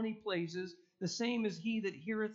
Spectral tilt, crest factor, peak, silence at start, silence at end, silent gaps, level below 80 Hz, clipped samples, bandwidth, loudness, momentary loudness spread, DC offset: -4.5 dB/octave; 14 dB; -26 dBFS; 0 s; 0 s; none; -82 dBFS; under 0.1%; 7.8 kHz; -38 LUFS; 8 LU; under 0.1%